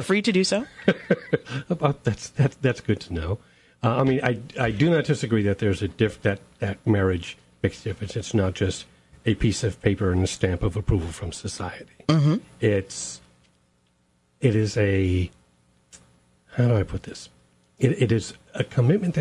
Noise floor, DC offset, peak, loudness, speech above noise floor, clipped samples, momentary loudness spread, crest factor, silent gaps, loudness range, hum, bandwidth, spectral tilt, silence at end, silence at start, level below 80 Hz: -66 dBFS; under 0.1%; -4 dBFS; -24 LUFS; 42 dB; under 0.1%; 11 LU; 20 dB; none; 3 LU; none; 11.5 kHz; -6 dB/octave; 0 s; 0 s; -44 dBFS